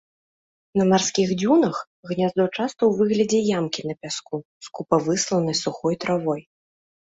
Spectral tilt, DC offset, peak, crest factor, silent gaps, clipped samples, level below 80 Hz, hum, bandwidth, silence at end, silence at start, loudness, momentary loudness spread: -5 dB/octave; under 0.1%; -4 dBFS; 18 dB; 1.87-2.03 s, 4.45-4.61 s; under 0.1%; -62 dBFS; none; 8 kHz; 0.7 s; 0.75 s; -22 LUFS; 12 LU